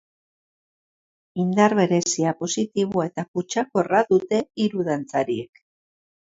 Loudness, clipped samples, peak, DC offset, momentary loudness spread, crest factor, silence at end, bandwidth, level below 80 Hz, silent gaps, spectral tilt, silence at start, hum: -22 LUFS; under 0.1%; -2 dBFS; under 0.1%; 9 LU; 20 dB; 0.85 s; 7.8 kHz; -66 dBFS; 3.28-3.34 s; -5 dB/octave; 1.35 s; none